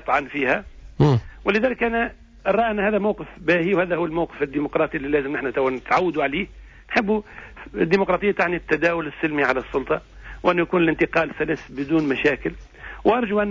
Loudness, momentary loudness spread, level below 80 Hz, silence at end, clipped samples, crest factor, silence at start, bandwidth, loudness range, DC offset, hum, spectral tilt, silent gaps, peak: -22 LUFS; 8 LU; -44 dBFS; 0 s; under 0.1%; 16 dB; 0 s; 7.6 kHz; 1 LU; under 0.1%; none; -7.5 dB/octave; none; -6 dBFS